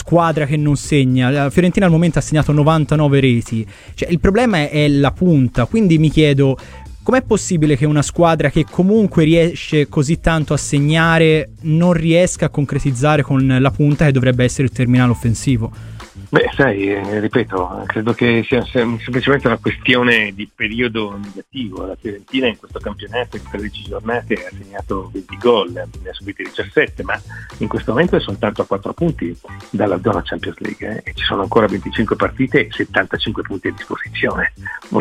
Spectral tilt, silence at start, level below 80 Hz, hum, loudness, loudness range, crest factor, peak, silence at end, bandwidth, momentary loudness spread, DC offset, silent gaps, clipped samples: -6 dB/octave; 0 s; -34 dBFS; none; -16 LUFS; 7 LU; 16 dB; 0 dBFS; 0 s; 11.5 kHz; 13 LU; under 0.1%; none; under 0.1%